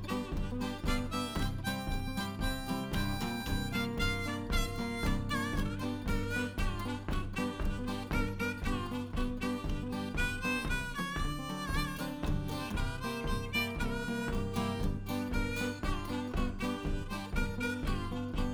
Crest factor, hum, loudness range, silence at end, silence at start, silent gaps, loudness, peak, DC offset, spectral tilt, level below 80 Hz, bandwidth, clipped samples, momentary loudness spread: 16 dB; none; 1 LU; 0 s; 0 s; none; -36 LUFS; -18 dBFS; under 0.1%; -5 dB/octave; -38 dBFS; over 20 kHz; under 0.1%; 4 LU